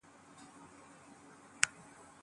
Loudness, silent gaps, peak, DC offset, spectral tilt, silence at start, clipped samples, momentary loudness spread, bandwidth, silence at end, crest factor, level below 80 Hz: -34 LUFS; none; -4 dBFS; under 0.1%; 0.5 dB/octave; 0.05 s; under 0.1%; 23 LU; 11.5 kHz; 0 s; 40 dB; -80 dBFS